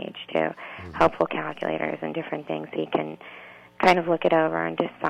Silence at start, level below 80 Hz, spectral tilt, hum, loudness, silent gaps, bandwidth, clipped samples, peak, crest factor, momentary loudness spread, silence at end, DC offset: 0 s; -60 dBFS; -6 dB/octave; none; -25 LUFS; none; 14 kHz; under 0.1%; -6 dBFS; 20 dB; 15 LU; 0 s; under 0.1%